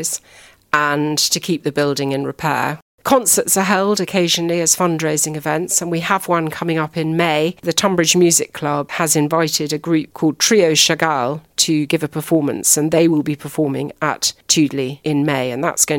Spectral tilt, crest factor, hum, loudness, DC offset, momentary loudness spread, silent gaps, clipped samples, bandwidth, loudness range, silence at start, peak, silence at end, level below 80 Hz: -3 dB/octave; 18 dB; none; -16 LUFS; under 0.1%; 8 LU; 2.82-2.98 s; under 0.1%; 17 kHz; 2 LU; 0 s; 0 dBFS; 0 s; -58 dBFS